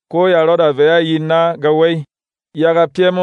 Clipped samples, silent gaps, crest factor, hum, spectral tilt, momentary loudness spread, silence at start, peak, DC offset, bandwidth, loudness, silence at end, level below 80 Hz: under 0.1%; none; 12 dB; none; -7.5 dB/octave; 5 LU; 0.1 s; -2 dBFS; under 0.1%; 7.2 kHz; -13 LUFS; 0 s; -70 dBFS